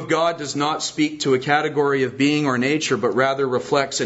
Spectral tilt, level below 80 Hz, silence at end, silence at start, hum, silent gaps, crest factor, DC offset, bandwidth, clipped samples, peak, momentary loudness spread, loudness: -4 dB/octave; -64 dBFS; 0 s; 0 s; none; none; 18 dB; under 0.1%; 8 kHz; under 0.1%; -2 dBFS; 4 LU; -20 LUFS